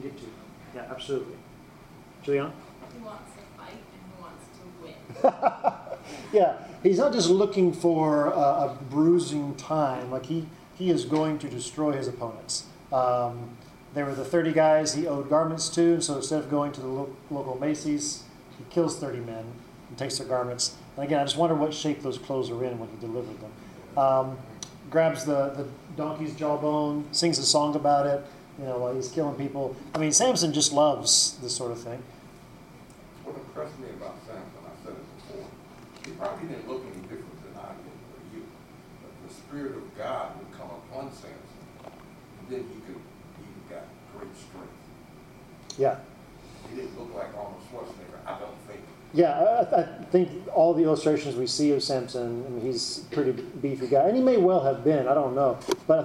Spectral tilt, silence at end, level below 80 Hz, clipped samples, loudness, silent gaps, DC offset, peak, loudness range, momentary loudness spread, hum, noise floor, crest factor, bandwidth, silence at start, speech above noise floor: -4 dB/octave; 0 s; -62 dBFS; under 0.1%; -26 LUFS; none; under 0.1%; -8 dBFS; 16 LU; 23 LU; none; -49 dBFS; 20 dB; 15.5 kHz; 0 s; 23 dB